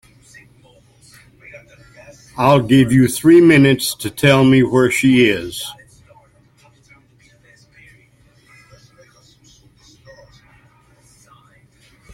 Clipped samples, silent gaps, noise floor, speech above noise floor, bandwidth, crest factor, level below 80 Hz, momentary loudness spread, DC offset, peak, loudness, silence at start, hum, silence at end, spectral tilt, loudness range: under 0.1%; none; -52 dBFS; 40 dB; 16.5 kHz; 18 dB; -50 dBFS; 15 LU; under 0.1%; 0 dBFS; -13 LUFS; 1.55 s; none; 6.4 s; -5.5 dB/octave; 8 LU